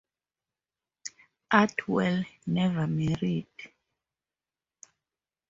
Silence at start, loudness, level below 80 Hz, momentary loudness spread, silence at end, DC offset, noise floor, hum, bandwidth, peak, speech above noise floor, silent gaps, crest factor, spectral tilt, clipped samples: 1.05 s; -28 LUFS; -62 dBFS; 20 LU; 1.85 s; under 0.1%; under -90 dBFS; none; 7.8 kHz; -6 dBFS; over 63 dB; none; 26 dB; -6 dB/octave; under 0.1%